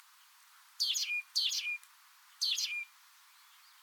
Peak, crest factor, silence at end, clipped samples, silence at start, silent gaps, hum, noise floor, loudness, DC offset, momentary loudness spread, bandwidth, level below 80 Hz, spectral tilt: -20 dBFS; 20 dB; 0.95 s; under 0.1%; 0.8 s; none; none; -62 dBFS; -33 LUFS; under 0.1%; 9 LU; 19 kHz; under -90 dBFS; 11.5 dB/octave